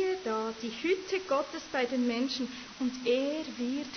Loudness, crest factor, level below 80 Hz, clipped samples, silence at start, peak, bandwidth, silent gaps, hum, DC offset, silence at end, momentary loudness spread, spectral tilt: -32 LUFS; 14 dB; -68 dBFS; under 0.1%; 0 s; -18 dBFS; 6.6 kHz; none; none; under 0.1%; 0 s; 6 LU; -3.5 dB/octave